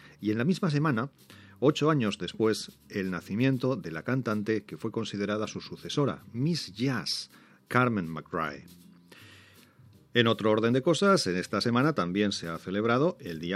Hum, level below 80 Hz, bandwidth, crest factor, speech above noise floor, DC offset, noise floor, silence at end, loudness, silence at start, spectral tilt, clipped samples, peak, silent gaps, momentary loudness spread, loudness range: none; -68 dBFS; 15 kHz; 22 dB; 29 dB; under 0.1%; -57 dBFS; 0 s; -29 LUFS; 0.05 s; -5.5 dB/octave; under 0.1%; -6 dBFS; none; 10 LU; 5 LU